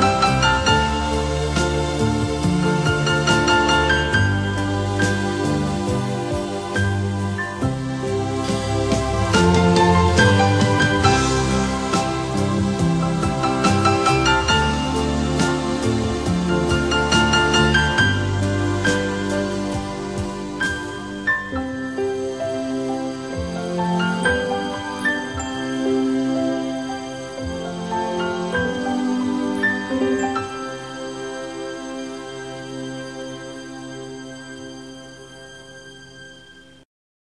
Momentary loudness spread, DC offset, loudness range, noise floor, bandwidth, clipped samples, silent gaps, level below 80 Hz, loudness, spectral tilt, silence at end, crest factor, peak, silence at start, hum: 15 LU; under 0.1%; 14 LU; -46 dBFS; 13 kHz; under 0.1%; none; -36 dBFS; -20 LUFS; -5 dB/octave; 0.75 s; 18 dB; -2 dBFS; 0 s; none